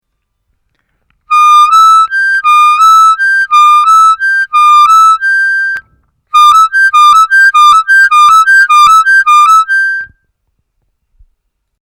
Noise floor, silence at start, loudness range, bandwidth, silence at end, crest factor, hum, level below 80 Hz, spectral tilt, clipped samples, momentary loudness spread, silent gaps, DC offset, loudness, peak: -65 dBFS; 1.3 s; 3 LU; 17.5 kHz; 1.9 s; 6 dB; none; -52 dBFS; 4 dB/octave; under 0.1%; 6 LU; none; under 0.1%; -4 LUFS; 0 dBFS